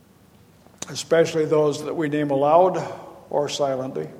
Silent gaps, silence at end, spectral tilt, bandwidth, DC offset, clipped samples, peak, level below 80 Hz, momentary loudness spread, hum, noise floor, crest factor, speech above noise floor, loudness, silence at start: none; 0 s; -5 dB/octave; 16 kHz; under 0.1%; under 0.1%; -2 dBFS; -66 dBFS; 15 LU; none; -53 dBFS; 20 dB; 32 dB; -22 LUFS; 0.8 s